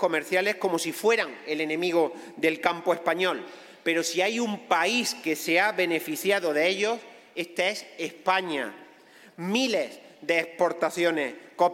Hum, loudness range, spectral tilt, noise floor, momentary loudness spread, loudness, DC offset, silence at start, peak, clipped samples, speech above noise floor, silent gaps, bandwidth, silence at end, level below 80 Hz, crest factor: none; 4 LU; -3 dB/octave; -53 dBFS; 10 LU; -26 LUFS; under 0.1%; 0 s; -6 dBFS; under 0.1%; 27 dB; none; 16.5 kHz; 0 s; -82 dBFS; 20 dB